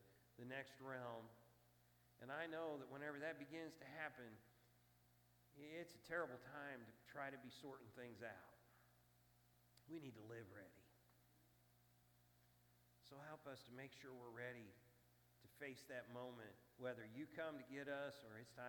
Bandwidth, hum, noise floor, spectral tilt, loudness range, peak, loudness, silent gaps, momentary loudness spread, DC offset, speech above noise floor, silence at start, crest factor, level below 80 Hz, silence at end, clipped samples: 19 kHz; 60 Hz at -80 dBFS; -76 dBFS; -5.5 dB/octave; 10 LU; -34 dBFS; -55 LUFS; none; 11 LU; under 0.1%; 22 dB; 0 s; 22 dB; -88 dBFS; 0 s; under 0.1%